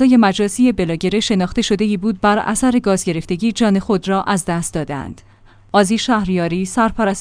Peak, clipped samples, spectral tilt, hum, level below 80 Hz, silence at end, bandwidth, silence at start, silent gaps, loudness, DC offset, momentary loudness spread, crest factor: 0 dBFS; under 0.1%; -5 dB/octave; none; -40 dBFS; 0 s; 10.5 kHz; 0 s; none; -17 LUFS; under 0.1%; 5 LU; 16 dB